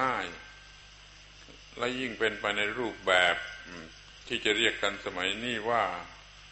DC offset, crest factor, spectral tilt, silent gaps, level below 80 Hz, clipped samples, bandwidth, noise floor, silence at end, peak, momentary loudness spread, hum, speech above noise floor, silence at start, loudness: under 0.1%; 22 dB; -2.5 dB/octave; none; -58 dBFS; under 0.1%; 8.2 kHz; -52 dBFS; 0 s; -10 dBFS; 25 LU; 50 Hz at -60 dBFS; 22 dB; 0 s; -29 LUFS